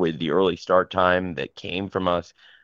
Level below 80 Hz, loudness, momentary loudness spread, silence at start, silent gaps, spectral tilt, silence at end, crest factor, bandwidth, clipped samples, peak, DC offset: -56 dBFS; -23 LUFS; 10 LU; 0 s; none; -6.5 dB/octave; 0.4 s; 20 dB; 7.4 kHz; under 0.1%; -4 dBFS; under 0.1%